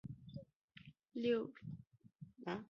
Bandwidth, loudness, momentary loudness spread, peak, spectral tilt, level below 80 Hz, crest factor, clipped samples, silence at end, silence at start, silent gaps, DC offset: 6.8 kHz; -44 LUFS; 23 LU; -26 dBFS; -5.5 dB/octave; -74 dBFS; 18 dB; under 0.1%; 0.05 s; 0.05 s; 0.56-0.68 s; under 0.1%